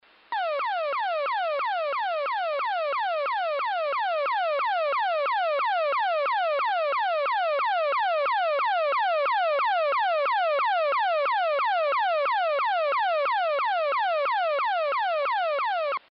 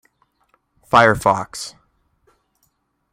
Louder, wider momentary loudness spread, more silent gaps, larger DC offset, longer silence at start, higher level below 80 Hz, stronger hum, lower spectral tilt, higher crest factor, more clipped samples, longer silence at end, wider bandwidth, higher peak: second, -25 LUFS vs -16 LUFS; second, 3 LU vs 18 LU; neither; neither; second, 0.3 s vs 0.95 s; second, -86 dBFS vs -50 dBFS; neither; second, 6 dB/octave vs -4.5 dB/octave; second, 8 dB vs 20 dB; neither; second, 0.15 s vs 1.45 s; second, 5.6 kHz vs 16 kHz; second, -18 dBFS vs 0 dBFS